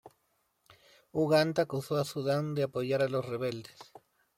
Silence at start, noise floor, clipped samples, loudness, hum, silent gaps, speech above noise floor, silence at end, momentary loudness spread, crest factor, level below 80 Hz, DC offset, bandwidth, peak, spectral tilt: 0.05 s; -76 dBFS; under 0.1%; -31 LUFS; none; none; 45 dB; 0.55 s; 11 LU; 20 dB; -74 dBFS; under 0.1%; 16.5 kHz; -14 dBFS; -6 dB/octave